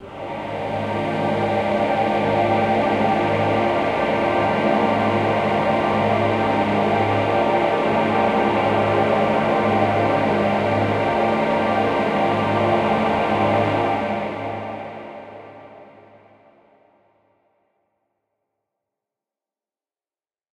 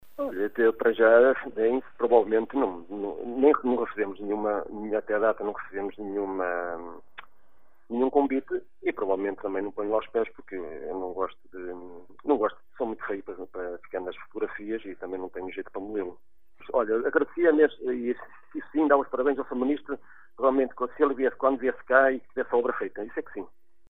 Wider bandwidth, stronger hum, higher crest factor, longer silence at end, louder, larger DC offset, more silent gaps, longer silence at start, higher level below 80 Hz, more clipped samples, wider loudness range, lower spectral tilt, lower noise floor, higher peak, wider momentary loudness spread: first, 11.5 kHz vs 4 kHz; neither; second, 16 dB vs 22 dB; first, 4.75 s vs 0.45 s; first, -19 LUFS vs -27 LUFS; second, under 0.1% vs 0.5%; neither; about the same, 0 s vs 0 s; first, -50 dBFS vs -62 dBFS; neither; about the same, 6 LU vs 8 LU; second, -7 dB/octave vs -8.5 dB/octave; first, under -90 dBFS vs -64 dBFS; about the same, -6 dBFS vs -6 dBFS; second, 8 LU vs 15 LU